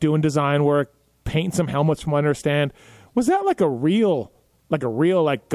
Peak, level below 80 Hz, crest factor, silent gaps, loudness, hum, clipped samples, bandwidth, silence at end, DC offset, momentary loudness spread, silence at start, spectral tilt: -6 dBFS; -48 dBFS; 14 dB; none; -21 LUFS; none; under 0.1%; 13.5 kHz; 0 s; under 0.1%; 8 LU; 0 s; -6.5 dB/octave